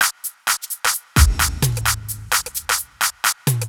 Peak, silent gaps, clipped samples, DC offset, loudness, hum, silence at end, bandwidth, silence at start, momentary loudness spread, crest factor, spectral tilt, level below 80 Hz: 0 dBFS; none; under 0.1%; under 0.1%; -19 LUFS; none; 0 s; over 20 kHz; 0 s; 5 LU; 20 dB; -2.5 dB/octave; -26 dBFS